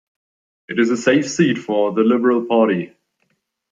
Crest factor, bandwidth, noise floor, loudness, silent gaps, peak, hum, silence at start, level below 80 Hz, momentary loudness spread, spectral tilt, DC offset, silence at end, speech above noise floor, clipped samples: 16 dB; 7.6 kHz; -69 dBFS; -17 LUFS; none; -2 dBFS; none; 0.7 s; -66 dBFS; 7 LU; -5.5 dB/octave; under 0.1%; 0.85 s; 52 dB; under 0.1%